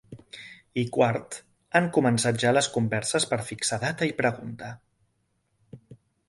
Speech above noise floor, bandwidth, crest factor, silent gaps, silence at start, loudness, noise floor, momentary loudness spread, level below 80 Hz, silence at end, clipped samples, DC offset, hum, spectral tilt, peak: 47 dB; 11.5 kHz; 22 dB; none; 0.1 s; -25 LUFS; -73 dBFS; 18 LU; -62 dBFS; 0.35 s; under 0.1%; under 0.1%; none; -4.5 dB/octave; -6 dBFS